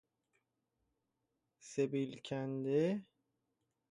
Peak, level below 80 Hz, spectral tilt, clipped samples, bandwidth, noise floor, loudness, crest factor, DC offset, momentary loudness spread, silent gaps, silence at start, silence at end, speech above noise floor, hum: -24 dBFS; -82 dBFS; -6.5 dB/octave; under 0.1%; 11 kHz; -86 dBFS; -38 LUFS; 18 dB; under 0.1%; 9 LU; none; 1.65 s; 0.9 s; 50 dB; none